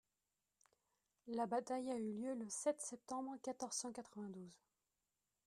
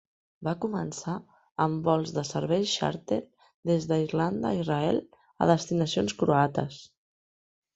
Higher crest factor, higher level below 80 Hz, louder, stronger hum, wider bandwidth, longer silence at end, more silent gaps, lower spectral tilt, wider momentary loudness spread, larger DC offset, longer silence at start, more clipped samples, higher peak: about the same, 20 dB vs 22 dB; second, -88 dBFS vs -60 dBFS; second, -45 LUFS vs -28 LUFS; neither; first, 13.5 kHz vs 8.2 kHz; about the same, 0.9 s vs 0.9 s; second, none vs 3.54-3.63 s; second, -4 dB/octave vs -6 dB/octave; about the same, 11 LU vs 11 LU; neither; first, 1.25 s vs 0.4 s; neither; second, -28 dBFS vs -6 dBFS